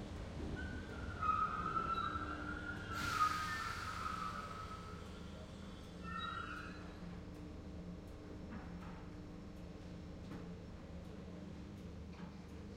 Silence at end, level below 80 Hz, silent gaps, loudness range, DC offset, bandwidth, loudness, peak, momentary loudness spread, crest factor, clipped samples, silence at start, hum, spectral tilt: 0 s; -56 dBFS; none; 12 LU; under 0.1%; 16.5 kHz; -45 LUFS; -24 dBFS; 14 LU; 20 dB; under 0.1%; 0 s; none; -5 dB/octave